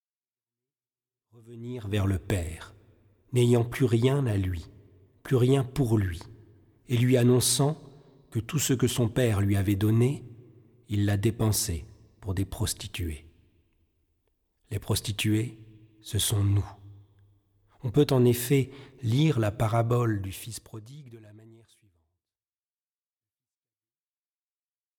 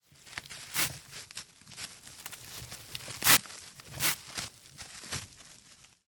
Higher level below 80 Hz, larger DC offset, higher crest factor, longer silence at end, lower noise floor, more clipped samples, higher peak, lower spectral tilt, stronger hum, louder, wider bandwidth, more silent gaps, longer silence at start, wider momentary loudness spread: first, -50 dBFS vs -62 dBFS; neither; second, 18 dB vs 32 dB; first, 3.6 s vs 0.45 s; first, under -90 dBFS vs -58 dBFS; neither; second, -10 dBFS vs -4 dBFS; first, -5.5 dB/octave vs -0.5 dB/octave; neither; about the same, -27 LUFS vs -29 LUFS; about the same, 18.5 kHz vs 19.5 kHz; neither; first, 1.45 s vs 0.25 s; second, 16 LU vs 22 LU